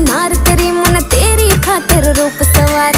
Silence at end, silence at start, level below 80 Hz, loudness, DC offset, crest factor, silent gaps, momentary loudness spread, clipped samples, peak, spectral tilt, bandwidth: 0 s; 0 s; -16 dBFS; -10 LUFS; under 0.1%; 10 dB; none; 2 LU; 0.2%; 0 dBFS; -4 dB/octave; 16.5 kHz